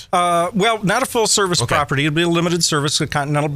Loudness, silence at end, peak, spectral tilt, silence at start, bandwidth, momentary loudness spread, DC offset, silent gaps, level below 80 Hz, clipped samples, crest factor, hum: -17 LUFS; 0 s; -2 dBFS; -3.5 dB/octave; 0 s; 16 kHz; 3 LU; under 0.1%; none; -46 dBFS; under 0.1%; 14 dB; none